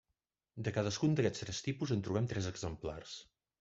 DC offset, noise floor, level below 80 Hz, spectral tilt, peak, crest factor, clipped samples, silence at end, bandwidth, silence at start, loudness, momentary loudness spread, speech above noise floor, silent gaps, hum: under 0.1%; -88 dBFS; -62 dBFS; -5.5 dB/octave; -18 dBFS; 20 dB; under 0.1%; 0.35 s; 8 kHz; 0.55 s; -37 LUFS; 15 LU; 51 dB; none; none